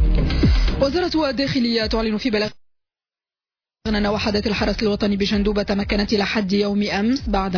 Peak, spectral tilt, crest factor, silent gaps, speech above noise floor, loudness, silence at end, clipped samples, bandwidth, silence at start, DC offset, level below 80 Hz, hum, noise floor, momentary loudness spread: -8 dBFS; -6 dB/octave; 12 dB; none; over 70 dB; -20 LUFS; 0 s; under 0.1%; 5.4 kHz; 0 s; under 0.1%; -26 dBFS; none; under -90 dBFS; 3 LU